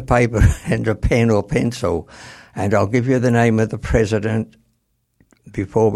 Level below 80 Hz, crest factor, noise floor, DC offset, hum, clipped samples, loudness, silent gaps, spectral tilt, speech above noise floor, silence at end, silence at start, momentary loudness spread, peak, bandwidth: -28 dBFS; 16 dB; -67 dBFS; under 0.1%; none; under 0.1%; -18 LUFS; none; -7 dB/octave; 50 dB; 0 s; 0 s; 13 LU; -2 dBFS; 12.5 kHz